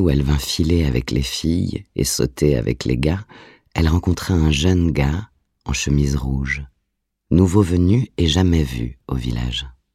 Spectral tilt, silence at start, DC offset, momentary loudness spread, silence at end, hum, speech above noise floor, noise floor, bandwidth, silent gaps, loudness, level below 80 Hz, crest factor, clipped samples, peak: -5.5 dB/octave; 0 s; under 0.1%; 10 LU; 0.25 s; none; 56 dB; -74 dBFS; 15 kHz; none; -19 LUFS; -28 dBFS; 18 dB; under 0.1%; -2 dBFS